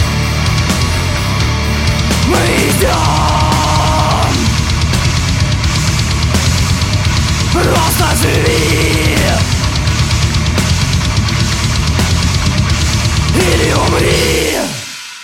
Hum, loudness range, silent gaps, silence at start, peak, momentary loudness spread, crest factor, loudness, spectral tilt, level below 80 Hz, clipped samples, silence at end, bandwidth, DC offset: none; 1 LU; none; 0 s; 0 dBFS; 3 LU; 12 dB; -12 LUFS; -4.5 dB/octave; -20 dBFS; under 0.1%; 0 s; 16.5 kHz; under 0.1%